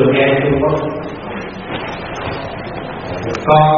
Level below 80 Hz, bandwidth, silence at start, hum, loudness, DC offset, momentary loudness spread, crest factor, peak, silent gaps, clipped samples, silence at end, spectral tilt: -38 dBFS; 7 kHz; 0 s; none; -18 LUFS; under 0.1%; 13 LU; 16 dB; 0 dBFS; none; under 0.1%; 0 s; -5 dB/octave